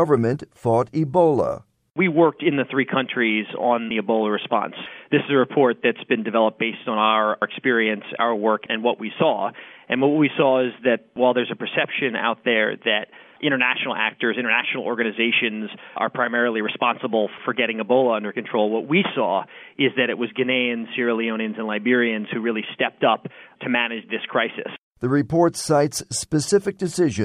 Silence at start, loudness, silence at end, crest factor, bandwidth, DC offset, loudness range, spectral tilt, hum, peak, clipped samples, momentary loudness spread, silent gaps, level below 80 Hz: 0 s; -21 LUFS; 0 s; 18 dB; 13 kHz; under 0.1%; 2 LU; -5 dB/octave; none; -4 dBFS; under 0.1%; 7 LU; 24.83-24.91 s; -62 dBFS